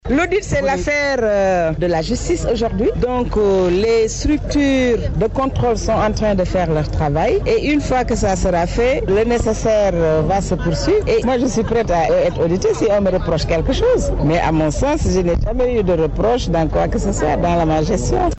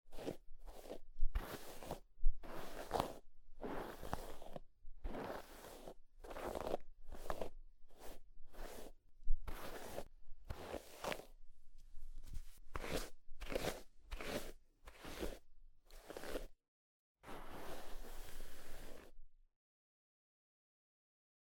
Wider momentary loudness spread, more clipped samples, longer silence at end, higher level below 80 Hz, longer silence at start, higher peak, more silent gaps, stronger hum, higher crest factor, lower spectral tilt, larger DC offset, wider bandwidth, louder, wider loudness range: second, 3 LU vs 16 LU; neither; second, 0 s vs 2.2 s; first, -26 dBFS vs -48 dBFS; about the same, 0.05 s vs 0.05 s; first, -8 dBFS vs -18 dBFS; second, none vs 16.68-17.15 s; neither; second, 8 dB vs 24 dB; first, -6 dB/octave vs -4.5 dB/octave; neither; second, 8.4 kHz vs 17 kHz; first, -17 LUFS vs -50 LUFS; second, 1 LU vs 9 LU